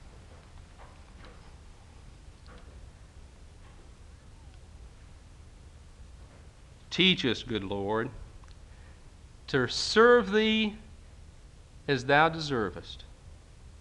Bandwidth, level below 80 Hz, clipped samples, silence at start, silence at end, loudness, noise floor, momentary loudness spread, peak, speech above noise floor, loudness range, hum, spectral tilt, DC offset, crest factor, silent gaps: 11 kHz; -52 dBFS; under 0.1%; 0.05 s; 0.05 s; -26 LUFS; -52 dBFS; 29 LU; -8 dBFS; 25 dB; 5 LU; none; -4.5 dB/octave; under 0.1%; 24 dB; none